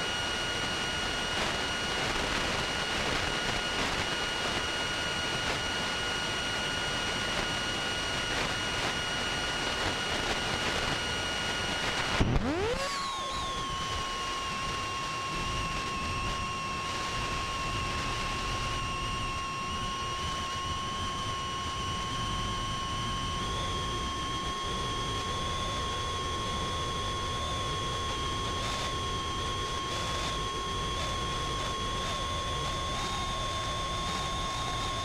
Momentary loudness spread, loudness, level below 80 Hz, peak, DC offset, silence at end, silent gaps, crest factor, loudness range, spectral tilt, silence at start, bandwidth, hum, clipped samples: 3 LU; -31 LUFS; -42 dBFS; -12 dBFS; under 0.1%; 0 s; none; 20 dB; 3 LU; -3 dB/octave; 0 s; 16 kHz; none; under 0.1%